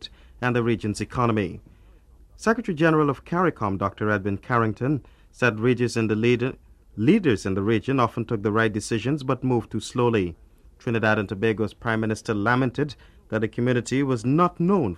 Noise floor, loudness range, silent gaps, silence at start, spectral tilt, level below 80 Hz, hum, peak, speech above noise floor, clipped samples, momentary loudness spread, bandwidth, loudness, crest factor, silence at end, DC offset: -51 dBFS; 2 LU; none; 0 s; -6.5 dB/octave; -50 dBFS; none; -6 dBFS; 28 dB; under 0.1%; 7 LU; 12 kHz; -24 LUFS; 18 dB; 0 s; under 0.1%